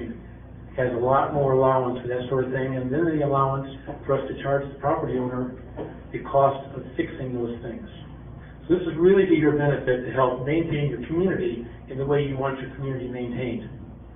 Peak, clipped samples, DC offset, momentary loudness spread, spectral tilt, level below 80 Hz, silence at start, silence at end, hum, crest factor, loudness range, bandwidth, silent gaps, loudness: -6 dBFS; under 0.1%; under 0.1%; 17 LU; -12 dB/octave; -46 dBFS; 0 s; 0 s; none; 18 dB; 5 LU; 3.7 kHz; none; -24 LUFS